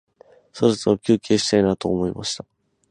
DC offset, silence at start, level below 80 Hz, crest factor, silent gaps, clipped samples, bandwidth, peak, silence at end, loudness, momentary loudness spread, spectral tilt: under 0.1%; 0.55 s; -50 dBFS; 18 dB; none; under 0.1%; 11 kHz; -2 dBFS; 0.5 s; -21 LUFS; 9 LU; -5 dB/octave